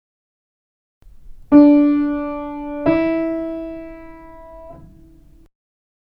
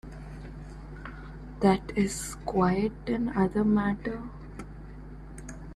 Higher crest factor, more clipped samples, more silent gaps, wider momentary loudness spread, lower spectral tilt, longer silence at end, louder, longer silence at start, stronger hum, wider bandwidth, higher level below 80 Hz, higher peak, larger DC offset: about the same, 20 dB vs 18 dB; neither; neither; first, 24 LU vs 19 LU; first, -9.5 dB/octave vs -6.5 dB/octave; first, 1.2 s vs 0 s; first, -16 LUFS vs -28 LUFS; first, 1.25 s vs 0.05 s; neither; second, 5 kHz vs 13 kHz; about the same, -44 dBFS vs -44 dBFS; first, 0 dBFS vs -10 dBFS; neither